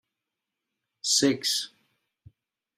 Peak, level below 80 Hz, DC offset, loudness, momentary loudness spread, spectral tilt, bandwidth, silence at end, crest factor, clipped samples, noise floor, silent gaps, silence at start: -8 dBFS; -72 dBFS; under 0.1%; -25 LUFS; 12 LU; -2 dB/octave; 15.5 kHz; 1.1 s; 22 dB; under 0.1%; -86 dBFS; none; 1.05 s